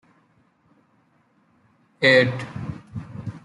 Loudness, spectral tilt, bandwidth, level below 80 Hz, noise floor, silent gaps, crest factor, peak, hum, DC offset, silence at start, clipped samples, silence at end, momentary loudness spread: -20 LUFS; -5.5 dB/octave; 11 kHz; -58 dBFS; -63 dBFS; none; 22 dB; -4 dBFS; none; under 0.1%; 2 s; under 0.1%; 0.05 s; 21 LU